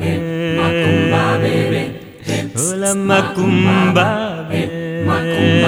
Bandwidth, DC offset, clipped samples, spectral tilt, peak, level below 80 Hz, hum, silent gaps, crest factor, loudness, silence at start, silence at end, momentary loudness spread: 16.5 kHz; under 0.1%; under 0.1%; -5 dB/octave; 0 dBFS; -50 dBFS; none; none; 14 dB; -16 LUFS; 0 s; 0 s; 8 LU